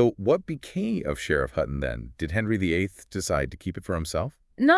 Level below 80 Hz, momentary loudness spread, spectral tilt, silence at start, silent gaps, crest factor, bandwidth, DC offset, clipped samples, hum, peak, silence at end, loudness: -44 dBFS; 8 LU; -5.5 dB/octave; 0 s; none; 20 dB; 12 kHz; under 0.1%; under 0.1%; none; -6 dBFS; 0 s; -28 LUFS